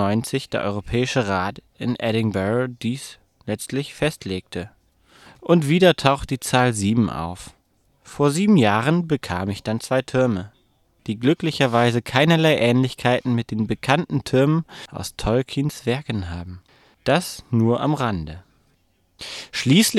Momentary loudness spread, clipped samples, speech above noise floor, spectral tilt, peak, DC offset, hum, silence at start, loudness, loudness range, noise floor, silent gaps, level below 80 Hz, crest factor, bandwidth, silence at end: 16 LU; under 0.1%; 43 dB; -5.5 dB/octave; 0 dBFS; under 0.1%; none; 0 s; -21 LUFS; 5 LU; -63 dBFS; none; -46 dBFS; 20 dB; 14.5 kHz; 0 s